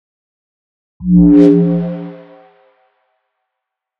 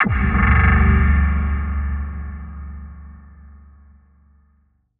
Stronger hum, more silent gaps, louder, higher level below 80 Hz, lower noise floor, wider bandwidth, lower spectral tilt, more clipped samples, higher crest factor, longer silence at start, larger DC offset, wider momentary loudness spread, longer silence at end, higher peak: neither; neither; first, -10 LUFS vs -18 LUFS; second, -36 dBFS vs -22 dBFS; first, -79 dBFS vs -60 dBFS; first, 4.2 kHz vs 3.5 kHz; first, -11 dB/octave vs -7 dB/octave; neither; about the same, 14 dB vs 16 dB; first, 1 s vs 0 s; neither; about the same, 19 LU vs 21 LU; first, 1.85 s vs 1.5 s; about the same, 0 dBFS vs -2 dBFS